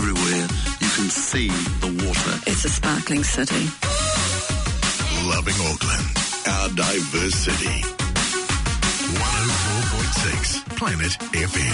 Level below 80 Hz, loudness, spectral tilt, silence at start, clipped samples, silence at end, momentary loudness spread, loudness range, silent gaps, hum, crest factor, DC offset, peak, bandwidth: -30 dBFS; -21 LUFS; -3 dB/octave; 0 s; under 0.1%; 0 s; 3 LU; 0 LU; none; none; 12 dB; under 0.1%; -10 dBFS; 11 kHz